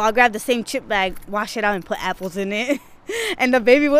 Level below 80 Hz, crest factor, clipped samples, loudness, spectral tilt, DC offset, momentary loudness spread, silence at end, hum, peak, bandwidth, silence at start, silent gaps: -46 dBFS; 18 dB; under 0.1%; -20 LUFS; -3.5 dB/octave; under 0.1%; 10 LU; 0 s; none; -2 dBFS; 15.5 kHz; 0 s; none